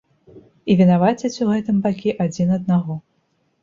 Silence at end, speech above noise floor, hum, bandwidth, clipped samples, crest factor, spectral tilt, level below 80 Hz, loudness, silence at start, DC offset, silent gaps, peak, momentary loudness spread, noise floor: 0.65 s; 48 dB; none; 7.4 kHz; under 0.1%; 16 dB; -7.5 dB/octave; -56 dBFS; -19 LUFS; 0.35 s; under 0.1%; none; -4 dBFS; 10 LU; -66 dBFS